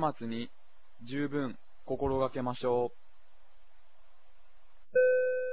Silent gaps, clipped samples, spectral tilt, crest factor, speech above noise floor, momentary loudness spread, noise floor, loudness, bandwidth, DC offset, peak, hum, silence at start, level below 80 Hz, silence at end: none; under 0.1%; -5 dB/octave; 18 dB; 32 dB; 14 LU; -65 dBFS; -32 LUFS; 4 kHz; 0.8%; -16 dBFS; none; 0 s; -58 dBFS; 0 s